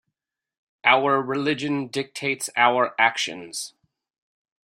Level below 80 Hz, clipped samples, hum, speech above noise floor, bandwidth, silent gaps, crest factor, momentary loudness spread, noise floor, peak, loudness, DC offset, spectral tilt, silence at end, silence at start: -72 dBFS; under 0.1%; none; 60 dB; 16 kHz; none; 22 dB; 13 LU; -82 dBFS; -2 dBFS; -22 LUFS; under 0.1%; -3 dB/octave; 0.95 s; 0.85 s